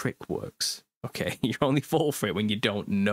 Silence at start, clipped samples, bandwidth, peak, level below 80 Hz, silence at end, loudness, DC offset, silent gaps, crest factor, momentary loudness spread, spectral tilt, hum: 0 s; under 0.1%; 16 kHz; -8 dBFS; -60 dBFS; 0 s; -28 LUFS; under 0.1%; 0.96-1.01 s; 20 dB; 10 LU; -4.5 dB/octave; none